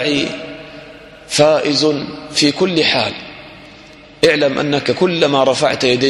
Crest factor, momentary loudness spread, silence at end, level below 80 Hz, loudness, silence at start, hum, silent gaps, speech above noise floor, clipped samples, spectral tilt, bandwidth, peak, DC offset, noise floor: 16 dB; 18 LU; 0 s; -52 dBFS; -15 LUFS; 0 s; none; none; 25 dB; under 0.1%; -4 dB/octave; 12.5 kHz; 0 dBFS; under 0.1%; -40 dBFS